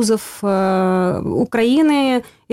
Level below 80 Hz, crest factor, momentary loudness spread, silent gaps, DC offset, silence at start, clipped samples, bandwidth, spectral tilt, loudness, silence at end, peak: -52 dBFS; 10 dB; 6 LU; none; under 0.1%; 0 s; under 0.1%; 16 kHz; -5.5 dB/octave; -17 LUFS; 0.3 s; -8 dBFS